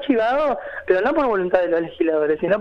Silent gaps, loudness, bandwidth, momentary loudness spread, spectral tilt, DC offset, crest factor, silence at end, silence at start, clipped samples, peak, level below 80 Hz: none; -20 LUFS; 6.6 kHz; 4 LU; -7.5 dB/octave; under 0.1%; 14 dB; 0 s; 0 s; under 0.1%; -4 dBFS; -50 dBFS